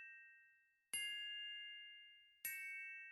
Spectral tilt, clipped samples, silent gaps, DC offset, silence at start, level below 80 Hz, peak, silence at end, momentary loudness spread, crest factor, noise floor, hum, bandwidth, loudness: 3.5 dB/octave; under 0.1%; none; under 0.1%; 0 s; under -90 dBFS; -34 dBFS; 0 s; 17 LU; 20 dB; -75 dBFS; none; 15 kHz; -48 LUFS